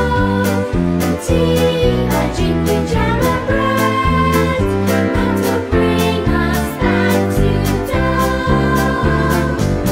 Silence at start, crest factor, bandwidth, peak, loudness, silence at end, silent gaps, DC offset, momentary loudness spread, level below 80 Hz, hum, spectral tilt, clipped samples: 0 s; 14 dB; 16.5 kHz; 0 dBFS; -15 LUFS; 0 s; none; under 0.1%; 3 LU; -24 dBFS; none; -6 dB/octave; under 0.1%